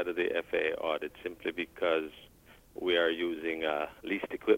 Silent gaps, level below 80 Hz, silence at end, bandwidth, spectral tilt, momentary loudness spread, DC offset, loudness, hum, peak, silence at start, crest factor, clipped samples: none; -64 dBFS; 0 s; 16 kHz; -5 dB/octave; 9 LU; under 0.1%; -33 LUFS; none; -14 dBFS; 0 s; 20 dB; under 0.1%